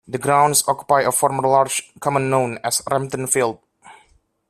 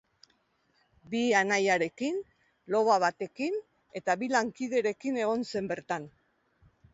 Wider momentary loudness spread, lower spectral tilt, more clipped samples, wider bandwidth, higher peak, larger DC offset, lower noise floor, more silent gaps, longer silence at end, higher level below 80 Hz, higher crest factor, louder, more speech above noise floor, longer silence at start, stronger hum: second, 7 LU vs 11 LU; about the same, -3.5 dB/octave vs -4 dB/octave; neither; first, 15.5 kHz vs 8 kHz; first, -2 dBFS vs -12 dBFS; neither; second, -58 dBFS vs -72 dBFS; neither; second, 0.55 s vs 0.85 s; first, -60 dBFS vs -72 dBFS; about the same, 18 dB vs 20 dB; first, -18 LUFS vs -29 LUFS; second, 39 dB vs 43 dB; second, 0.1 s vs 1.1 s; neither